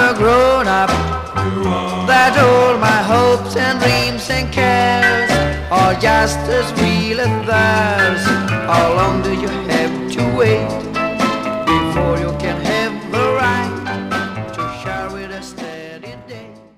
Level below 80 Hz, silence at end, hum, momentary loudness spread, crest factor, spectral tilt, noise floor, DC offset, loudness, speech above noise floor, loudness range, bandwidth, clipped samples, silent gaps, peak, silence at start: -34 dBFS; 0.2 s; none; 12 LU; 14 dB; -5 dB/octave; -35 dBFS; 0.2%; -15 LUFS; 21 dB; 6 LU; 15.5 kHz; under 0.1%; none; -2 dBFS; 0 s